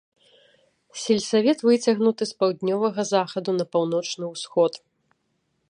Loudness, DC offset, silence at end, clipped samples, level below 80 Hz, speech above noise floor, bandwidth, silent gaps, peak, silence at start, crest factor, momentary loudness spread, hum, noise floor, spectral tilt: -23 LUFS; under 0.1%; 0.95 s; under 0.1%; -72 dBFS; 50 dB; 10.5 kHz; none; -6 dBFS; 0.95 s; 18 dB; 10 LU; none; -72 dBFS; -5 dB/octave